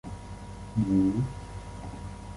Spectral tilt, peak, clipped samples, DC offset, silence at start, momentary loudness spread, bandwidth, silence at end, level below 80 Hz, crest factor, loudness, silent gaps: -8 dB/octave; -14 dBFS; under 0.1%; under 0.1%; 0.05 s; 17 LU; 11.5 kHz; 0 s; -44 dBFS; 16 dB; -29 LUFS; none